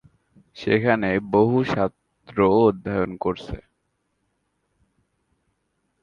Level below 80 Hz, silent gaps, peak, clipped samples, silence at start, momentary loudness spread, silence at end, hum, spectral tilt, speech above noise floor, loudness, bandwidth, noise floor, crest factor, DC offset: -50 dBFS; none; -4 dBFS; under 0.1%; 0.55 s; 14 LU; 2.45 s; none; -8 dB/octave; 53 dB; -22 LUFS; 7 kHz; -73 dBFS; 20 dB; under 0.1%